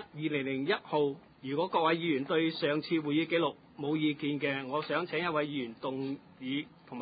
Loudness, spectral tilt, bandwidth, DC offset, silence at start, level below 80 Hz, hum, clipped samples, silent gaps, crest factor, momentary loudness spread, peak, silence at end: -32 LUFS; -3.5 dB/octave; 4.9 kHz; under 0.1%; 0 s; -74 dBFS; none; under 0.1%; none; 16 dB; 9 LU; -16 dBFS; 0 s